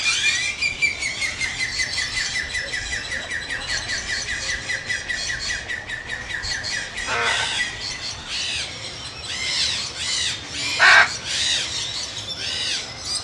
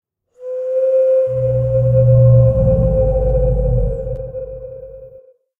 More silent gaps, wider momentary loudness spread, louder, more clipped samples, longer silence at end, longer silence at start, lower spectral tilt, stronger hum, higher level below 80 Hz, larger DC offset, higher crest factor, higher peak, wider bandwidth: neither; second, 8 LU vs 20 LU; second, -22 LUFS vs -15 LUFS; neither; second, 0 s vs 0.5 s; second, 0 s vs 0.4 s; second, 0 dB/octave vs -12.5 dB/octave; neither; second, -46 dBFS vs -24 dBFS; neither; first, 24 dB vs 14 dB; about the same, 0 dBFS vs -2 dBFS; first, 12 kHz vs 2.6 kHz